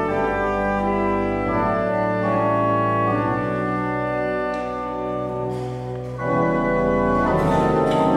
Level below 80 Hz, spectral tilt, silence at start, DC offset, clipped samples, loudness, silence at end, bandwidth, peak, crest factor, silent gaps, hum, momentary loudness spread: -40 dBFS; -8 dB/octave; 0 s; under 0.1%; under 0.1%; -21 LUFS; 0 s; 12.5 kHz; -6 dBFS; 14 dB; none; none; 8 LU